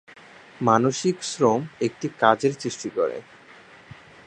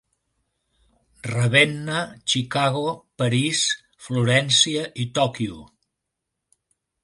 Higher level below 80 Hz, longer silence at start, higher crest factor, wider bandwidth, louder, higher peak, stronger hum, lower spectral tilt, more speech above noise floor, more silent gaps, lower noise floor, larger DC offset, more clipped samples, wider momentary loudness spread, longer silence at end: second, -66 dBFS vs -60 dBFS; second, 0.6 s vs 1.25 s; about the same, 24 dB vs 22 dB; second, 10 kHz vs 11.5 kHz; about the same, -23 LUFS vs -21 LUFS; about the same, -2 dBFS vs -2 dBFS; neither; first, -5 dB/octave vs -3.5 dB/octave; second, 26 dB vs 59 dB; neither; second, -49 dBFS vs -81 dBFS; neither; neither; second, 9 LU vs 12 LU; second, 1.05 s vs 1.4 s